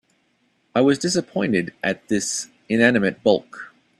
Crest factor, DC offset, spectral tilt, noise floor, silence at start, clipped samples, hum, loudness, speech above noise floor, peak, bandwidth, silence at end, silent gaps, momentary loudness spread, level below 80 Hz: 20 dB; under 0.1%; -4.5 dB/octave; -65 dBFS; 0.75 s; under 0.1%; none; -21 LUFS; 45 dB; -2 dBFS; 12.5 kHz; 0.3 s; none; 9 LU; -60 dBFS